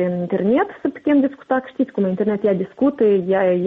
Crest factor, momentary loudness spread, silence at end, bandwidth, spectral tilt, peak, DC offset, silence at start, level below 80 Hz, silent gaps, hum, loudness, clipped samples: 10 dB; 6 LU; 0 s; 4 kHz; -10 dB/octave; -8 dBFS; under 0.1%; 0 s; -60 dBFS; none; none; -19 LUFS; under 0.1%